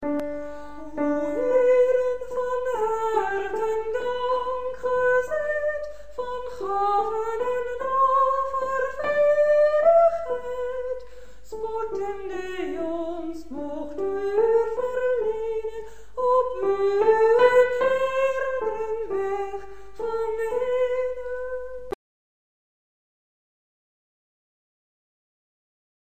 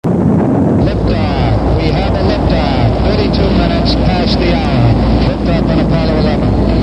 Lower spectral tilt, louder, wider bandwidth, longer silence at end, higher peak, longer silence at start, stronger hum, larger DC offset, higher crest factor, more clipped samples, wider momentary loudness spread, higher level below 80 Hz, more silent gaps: second, -5 dB/octave vs -8.5 dB/octave; second, -24 LUFS vs -12 LUFS; first, 15.5 kHz vs 9 kHz; first, 4.05 s vs 0 s; second, -6 dBFS vs 0 dBFS; about the same, 0 s vs 0.05 s; neither; first, 1% vs 0.4%; first, 20 dB vs 10 dB; neither; first, 15 LU vs 2 LU; second, -54 dBFS vs -18 dBFS; neither